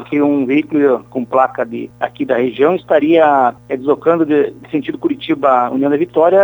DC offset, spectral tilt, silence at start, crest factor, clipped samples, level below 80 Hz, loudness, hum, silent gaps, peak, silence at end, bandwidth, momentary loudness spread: under 0.1%; -8 dB/octave; 0 s; 14 dB; under 0.1%; -56 dBFS; -14 LUFS; none; none; 0 dBFS; 0 s; over 20 kHz; 9 LU